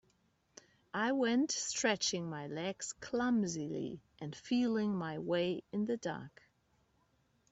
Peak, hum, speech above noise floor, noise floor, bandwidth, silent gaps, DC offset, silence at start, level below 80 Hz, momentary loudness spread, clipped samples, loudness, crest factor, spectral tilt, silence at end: -18 dBFS; none; 39 dB; -75 dBFS; 8.4 kHz; none; under 0.1%; 0.95 s; -74 dBFS; 12 LU; under 0.1%; -36 LUFS; 20 dB; -4 dB/octave; 1.2 s